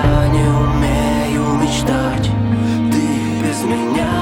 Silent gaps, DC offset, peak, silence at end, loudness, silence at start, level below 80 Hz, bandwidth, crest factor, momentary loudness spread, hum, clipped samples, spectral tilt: none; under 0.1%; -2 dBFS; 0 s; -16 LUFS; 0 s; -26 dBFS; 16.5 kHz; 14 dB; 4 LU; none; under 0.1%; -6 dB/octave